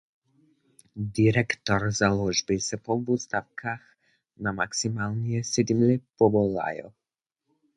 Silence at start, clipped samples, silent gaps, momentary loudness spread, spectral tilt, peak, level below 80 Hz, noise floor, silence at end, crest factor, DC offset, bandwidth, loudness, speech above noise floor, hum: 0.95 s; under 0.1%; none; 12 LU; -5 dB/octave; -8 dBFS; -54 dBFS; -87 dBFS; 0.85 s; 20 dB; under 0.1%; 11.5 kHz; -26 LUFS; 62 dB; none